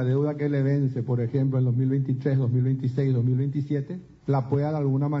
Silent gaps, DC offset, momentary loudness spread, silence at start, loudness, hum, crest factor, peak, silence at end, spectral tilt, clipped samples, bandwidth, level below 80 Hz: none; under 0.1%; 4 LU; 0 s; -25 LUFS; none; 12 dB; -12 dBFS; 0 s; -11 dB/octave; under 0.1%; 5.6 kHz; -60 dBFS